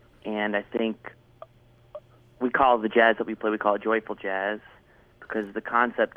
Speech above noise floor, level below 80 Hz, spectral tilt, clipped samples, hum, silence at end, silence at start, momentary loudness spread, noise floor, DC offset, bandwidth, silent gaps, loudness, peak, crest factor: 32 dB; -62 dBFS; -7 dB/octave; under 0.1%; none; 0.1 s; 0.25 s; 21 LU; -57 dBFS; under 0.1%; 5.6 kHz; none; -25 LUFS; -6 dBFS; 20 dB